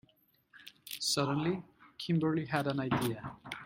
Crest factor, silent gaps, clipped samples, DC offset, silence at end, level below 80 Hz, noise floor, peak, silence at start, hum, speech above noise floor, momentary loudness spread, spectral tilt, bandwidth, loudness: 20 dB; none; under 0.1%; under 0.1%; 0 s; -66 dBFS; -70 dBFS; -14 dBFS; 0.55 s; none; 38 dB; 20 LU; -5 dB/octave; 16 kHz; -34 LUFS